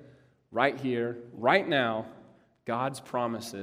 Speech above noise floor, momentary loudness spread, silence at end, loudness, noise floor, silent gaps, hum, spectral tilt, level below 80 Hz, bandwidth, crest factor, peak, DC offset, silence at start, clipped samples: 29 dB; 12 LU; 0 s; -29 LUFS; -58 dBFS; none; none; -5 dB/octave; -74 dBFS; 15.5 kHz; 22 dB; -8 dBFS; under 0.1%; 0 s; under 0.1%